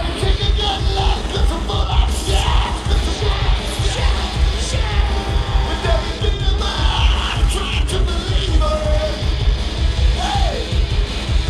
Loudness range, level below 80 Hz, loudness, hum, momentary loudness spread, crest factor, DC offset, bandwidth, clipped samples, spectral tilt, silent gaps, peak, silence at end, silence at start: 1 LU; -18 dBFS; -19 LUFS; none; 3 LU; 14 dB; under 0.1%; 12 kHz; under 0.1%; -4.5 dB/octave; none; -2 dBFS; 0 s; 0 s